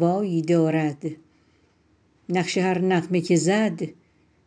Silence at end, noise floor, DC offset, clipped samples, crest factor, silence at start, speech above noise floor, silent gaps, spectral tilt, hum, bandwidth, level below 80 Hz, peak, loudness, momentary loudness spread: 0.55 s; -62 dBFS; under 0.1%; under 0.1%; 16 dB; 0 s; 40 dB; none; -6 dB/octave; none; 10 kHz; -70 dBFS; -8 dBFS; -23 LUFS; 13 LU